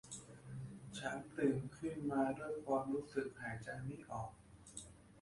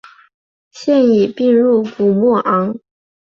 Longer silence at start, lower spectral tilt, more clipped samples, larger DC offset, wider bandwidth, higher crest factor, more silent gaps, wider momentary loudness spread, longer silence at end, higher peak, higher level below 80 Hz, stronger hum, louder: second, 0.05 s vs 0.75 s; second, -6 dB/octave vs -7.5 dB/octave; neither; neither; first, 11.5 kHz vs 7.4 kHz; first, 20 dB vs 12 dB; neither; first, 15 LU vs 10 LU; second, 0 s vs 0.45 s; second, -24 dBFS vs -4 dBFS; second, -68 dBFS vs -60 dBFS; neither; second, -43 LUFS vs -14 LUFS